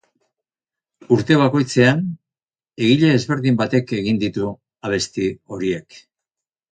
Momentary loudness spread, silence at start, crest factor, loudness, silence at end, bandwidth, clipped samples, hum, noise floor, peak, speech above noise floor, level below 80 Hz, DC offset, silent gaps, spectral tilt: 11 LU; 1.1 s; 20 dB; -19 LUFS; 0.75 s; 9.4 kHz; under 0.1%; none; under -90 dBFS; 0 dBFS; over 72 dB; -54 dBFS; under 0.1%; none; -6 dB/octave